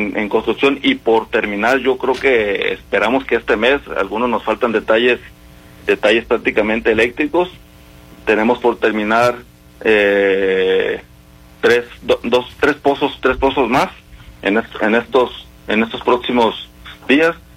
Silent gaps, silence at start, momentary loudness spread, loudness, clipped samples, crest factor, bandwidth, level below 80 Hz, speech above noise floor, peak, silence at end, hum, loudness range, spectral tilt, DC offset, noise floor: none; 0 s; 6 LU; -16 LUFS; under 0.1%; 16 dB; 16 kHz; -42 dBFS; 27 dB; -2 dBFS; 0.2 s; none; 2 LU; -5 dB/octave; under 0.1%; -43 dBFS